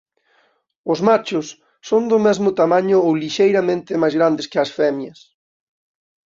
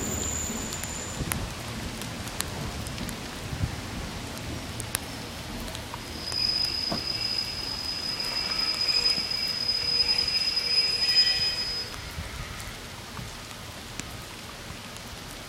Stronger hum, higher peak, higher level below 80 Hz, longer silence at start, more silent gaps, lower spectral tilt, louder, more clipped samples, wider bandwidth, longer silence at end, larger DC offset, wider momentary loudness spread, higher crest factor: neither; about the same, -2 dBFS vs -2 dBFS; second, -64 dBFS vs -44 dBFS; first, 0.85 s vs 0 s; neither; first, -5.5 dB/octave vs -2 dB/octave; first, -17 LUFS vs -27 LUFS; neither; second, 7.6 kHz vs 16.5 kHz; first, 1.2 s vs 0 s; neither; second, 12 LU vs 17 LU; second, 16 dB vs 28 dB